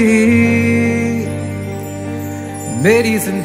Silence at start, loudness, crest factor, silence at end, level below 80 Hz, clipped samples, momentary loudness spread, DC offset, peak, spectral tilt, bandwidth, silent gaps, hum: 0 s; -15 LUFS; 14 dB; 0 s; -48 dBFS; under 0.1%; 13 LU; under 0.1%; 0 dBFS; -6 dB/octave; 16 kHz; none; 50 Hz at -45 dBFS